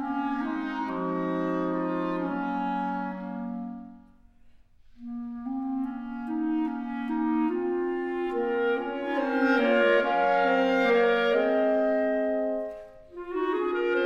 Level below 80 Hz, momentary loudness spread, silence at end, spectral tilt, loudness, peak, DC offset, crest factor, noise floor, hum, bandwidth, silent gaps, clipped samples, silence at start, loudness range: -60 dBFS; 13 LU; 0 s; -7 dB/octave; -27 LUFS; -12 dBFS; under 0.1%; 16 dB; -55 dBFS; none; 7.2 kHz; none; under 0.1%; 0 s; 11 LU